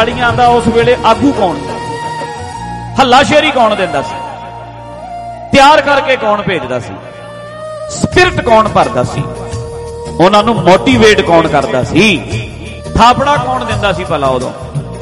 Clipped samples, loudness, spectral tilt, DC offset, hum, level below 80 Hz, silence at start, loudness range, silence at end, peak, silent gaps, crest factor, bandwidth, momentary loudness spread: 0.6%; -10 LUFS; -5 dB/octave; under 0.1%; none; -32 dBFS; 0 s; 3 LU; 0 s; 0 dBFS; none; 10 dB; 14 kHz; 18 LU